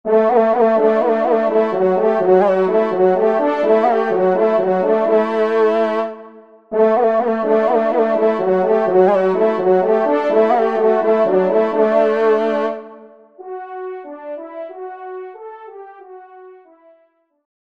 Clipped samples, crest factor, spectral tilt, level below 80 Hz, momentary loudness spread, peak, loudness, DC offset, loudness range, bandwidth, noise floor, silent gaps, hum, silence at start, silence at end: under 0.1%; 14 dB; -8 dB/octave; -66 dBFS; 17 LU; -2 dBFS; -15 LUFS; under 0.1%; 17 LU; 6.4 kHz; -58 dBFS; none; none; 0.05 s; 1.1 s